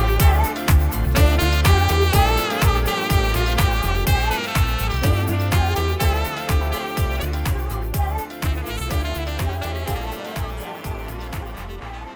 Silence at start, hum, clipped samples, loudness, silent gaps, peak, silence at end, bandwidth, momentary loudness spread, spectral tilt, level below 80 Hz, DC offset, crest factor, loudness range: 0 s; none; under 0.1%; -21 LUFS; none; -2 dBFS; 0 s; over 20 kHz; 14 LU; -5 dB/octave; -24 dBFS; under 0.1%; 16 dB; 9 LU